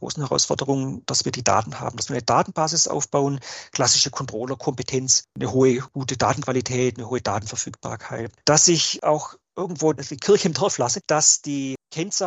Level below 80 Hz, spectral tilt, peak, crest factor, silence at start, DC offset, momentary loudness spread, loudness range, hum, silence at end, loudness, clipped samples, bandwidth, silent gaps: -60 dBFS; -3 dB/octave; -2 dBFS; 22 dB; 0 s; under 0.1%; 13 LU; 2 LU; none; 0 s; -21 LUFS; under 0.1%; 8.6 kHz; none